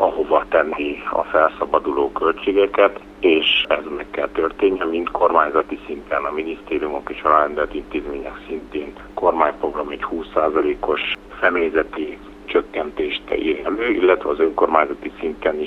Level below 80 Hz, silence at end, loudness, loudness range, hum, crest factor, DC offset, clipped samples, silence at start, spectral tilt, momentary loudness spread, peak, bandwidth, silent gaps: -46 dBFS; 0 s; -20 LUFS; 4 LU; 50 Hz at -55 dBFS; 20 dB; under 0.1%; under 0.1%; 0 s; -5.5 dB/octave; 11 LU; 0 dBFS; 6 kHz; none